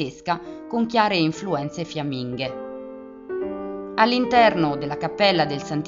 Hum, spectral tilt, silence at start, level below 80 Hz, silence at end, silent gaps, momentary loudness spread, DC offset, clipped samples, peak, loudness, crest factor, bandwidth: none; -3.5 dB/octave; 0 s; -56 dBFS; 0 s; none; 15 LU; under 0.1%; under 0.1%; -2 dBFS; -22 LUFS; 20 dB; 7.6 kHz